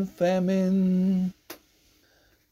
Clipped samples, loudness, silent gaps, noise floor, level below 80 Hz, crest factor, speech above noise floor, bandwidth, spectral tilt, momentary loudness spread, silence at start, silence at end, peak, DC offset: under 0.1%; -25 LUFS; none; -63 dBFS; -62 dBFS; 14 dB; 39 dB; 15 kHz; -8 dB/octave; 23 LU; 0 s; 0.95 s; -12 dBFS; under 0.1%